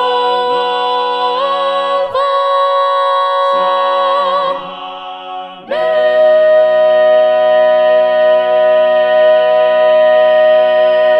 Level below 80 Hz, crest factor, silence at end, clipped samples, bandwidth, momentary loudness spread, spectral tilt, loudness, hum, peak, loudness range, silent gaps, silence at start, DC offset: -64 dBFS; 10 dB; 0 s; under 0.1%; 8.2 kHz; 9 LU; -4 dB/octave; -11 LUFS; none; -2 dBFS; 4 LU; none; 0 s; under 0.1%